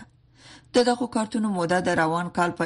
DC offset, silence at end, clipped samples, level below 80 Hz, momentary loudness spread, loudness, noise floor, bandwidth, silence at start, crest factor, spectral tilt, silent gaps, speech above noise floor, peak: under 0.1%; 0 s; under 0.1%; -58 dBFS; 4 LU; -24 LUFS; -52 dBFS; 11.5 kHz; 0 s; 18 dB; -5 dB/octave; none; 29 dB; -6 dBFS